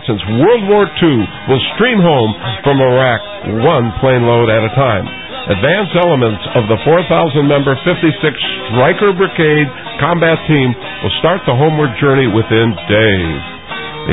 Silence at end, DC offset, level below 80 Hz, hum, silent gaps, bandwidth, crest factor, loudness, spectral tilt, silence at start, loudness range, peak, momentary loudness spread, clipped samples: 0 s; 0.8%; -36 dBFS; none; none; 4 kHz; 12 dB; -12 LUFS; -11 dB/octave; 0 s; 1 LU; 0 dBFS; 7 LU; under 0.1%